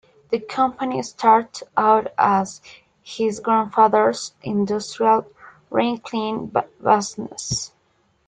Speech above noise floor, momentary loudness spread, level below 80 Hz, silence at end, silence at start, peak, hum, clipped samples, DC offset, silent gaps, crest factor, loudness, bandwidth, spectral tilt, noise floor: 44 dB; 11 LU; -60 dBFS; 0.6 s; 0.3 s; -2 dBFS; none; under 0.1%; under 0.1%; none; 20 dB; -21 LUFS; 9.4 kHz; -4.5 dB/octave; -64 dBFS